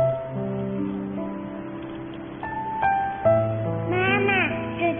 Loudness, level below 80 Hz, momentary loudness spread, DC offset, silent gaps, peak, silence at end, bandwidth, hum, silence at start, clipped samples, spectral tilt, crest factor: -25 LUFS; -52 dBFS; 14 LU; under 0.1%; none; -8 dBFS; 0 s; 3.7 kHz; none; 0 s; under 0.1%; -5 dB/octave; 18 dB